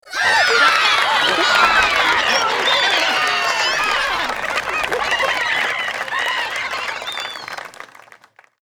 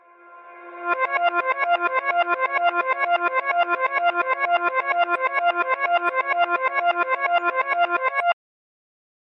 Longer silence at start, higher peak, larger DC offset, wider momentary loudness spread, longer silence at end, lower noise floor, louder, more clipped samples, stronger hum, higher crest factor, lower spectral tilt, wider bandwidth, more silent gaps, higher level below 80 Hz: second, 0.05 s vs 0.25 s; first, 0 dBFS vs -8 dBFS; neither; first, 12 LU vs 2 LU; second, 0.75 s vs 0.9 s; about the same, -48 dBFS vs -46 dBFS; first, -16 LUFS vs -21 LUFS; neither; neither; about the same, 18 dB vs 14 dB; second, -0.5 dB/octave vs -3.5 dB/octave; first, over 20 kHz vs 5.8 kHz; neither; first, -50 dBFS vs under -90 dBFS